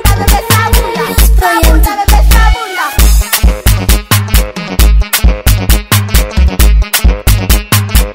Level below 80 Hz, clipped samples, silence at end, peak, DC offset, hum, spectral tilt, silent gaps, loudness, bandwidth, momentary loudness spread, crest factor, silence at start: -8 dBFS; 1%; 0 s; 0 dBFS; under 0.1%; none; -4 dB/octave; none; -9 LUFS; 16.5 kHz; 4 LU; 8 dB; 0 s